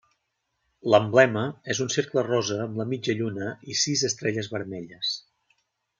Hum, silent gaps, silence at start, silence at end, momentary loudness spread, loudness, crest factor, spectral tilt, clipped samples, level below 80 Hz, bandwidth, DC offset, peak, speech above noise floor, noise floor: none; none; 0.85 s; 0.8 s; 13 LU; -25 LUFS; 24 dB; -4 dB/octave; under 0.1%; -70 dBFS; 9.6 kHz; under 0.1%; -2 dBFS; 52 dB; -77 dBFS